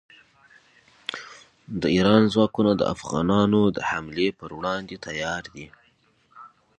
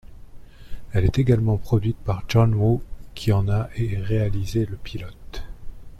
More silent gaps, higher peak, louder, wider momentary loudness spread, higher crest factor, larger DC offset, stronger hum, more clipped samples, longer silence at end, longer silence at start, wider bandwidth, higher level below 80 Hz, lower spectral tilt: neither; first, -2 dBFS vs -6 dBFS; about the same, -23 LUFS vs -23 LUFS; about the same, 17 LU vs 19 LU; first, 22 dB vs 16 dB; neither; neither; neither; first, 0.35 s vs 0 s; first, 1.1 s vs 0.05 s; second, 9 kHz vs 13 kHz; second, -52 dBFS vs -36 dBFS; second, -6 dB/octave vs -8 dB/octave